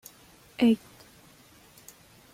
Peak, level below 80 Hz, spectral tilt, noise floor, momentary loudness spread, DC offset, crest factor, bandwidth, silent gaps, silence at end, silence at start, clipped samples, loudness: -12 dBFS; -66 dBFS; -5.5 dB/octave; -56 dBFS; 26 LU; under 0.1%; 20 dB; 16 kHz; none; 1.55 s; 0.6 s; under 0.1%; -26 LUFS